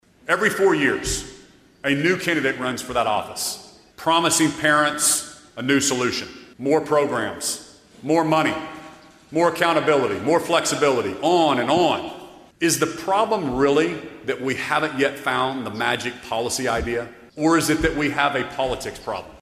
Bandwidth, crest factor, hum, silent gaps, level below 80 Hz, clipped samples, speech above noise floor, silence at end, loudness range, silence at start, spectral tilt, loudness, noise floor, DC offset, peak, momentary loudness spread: 15.5 kHz; 18 dB; none; none; -46 dBFS; under 0.1%; 28 dB; 0.05 s; 3 LU; 0.25 s; -3.5 dB/octave; -21 LUFS; -49 dBFS; under 0.1%; -4 dBFS; 11 LU